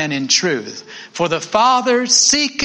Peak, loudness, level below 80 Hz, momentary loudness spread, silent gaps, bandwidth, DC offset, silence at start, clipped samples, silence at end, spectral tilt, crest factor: 0 dBFS; -14 LUFS; -56 dBFS; 18 LU; none; 10.5 kHz; under 0.1%; 0 s; under 0.1%; 0 s; -1.5 dB/octave; 16 dB